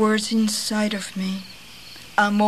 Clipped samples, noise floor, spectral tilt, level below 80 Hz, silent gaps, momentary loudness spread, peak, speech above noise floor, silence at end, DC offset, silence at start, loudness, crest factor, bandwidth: under 0.1%; -42 dBFS; -4 dB/octave; -60 dBFS; none; 19 LU; -4 dBFS; 21 dB; 0 s; 0.4%; 0 s; -23 LUFS; 18 dB; 14 kHz